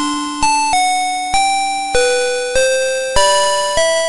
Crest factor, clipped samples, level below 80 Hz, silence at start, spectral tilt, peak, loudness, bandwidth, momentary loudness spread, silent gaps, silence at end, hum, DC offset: 14 dB; under 0.1%; -34 dBFS; 0 s; -1 dB/octave; 0 dBFS; -14 LUFS; 11.5 kHz; 4 LU; none; 0 s; none; under 0.1%